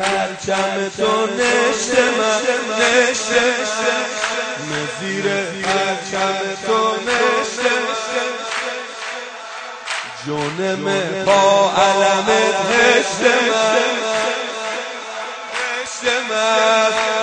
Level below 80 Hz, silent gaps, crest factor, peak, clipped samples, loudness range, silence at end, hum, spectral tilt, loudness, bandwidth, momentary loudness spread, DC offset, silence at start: -58 dBFS; none; 18 dB; 0 dBFS; under 0.1%; 6 LU; 0 s; none; -2.5 dB/octave; -17 LUFS; 9.4 kHz; 11 LU; under 0.1%; 0 s